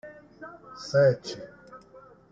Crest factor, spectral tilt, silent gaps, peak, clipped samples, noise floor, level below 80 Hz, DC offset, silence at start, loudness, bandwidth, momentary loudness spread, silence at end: 18 dB; -6 dB/octave; none; -10 dBFS; under 0.1%; -53 dBFS; -66 dBFS; under 0.1%; 0.05 s; -25 LUFS; 7.6 kHz; 26 LU; 0.55 s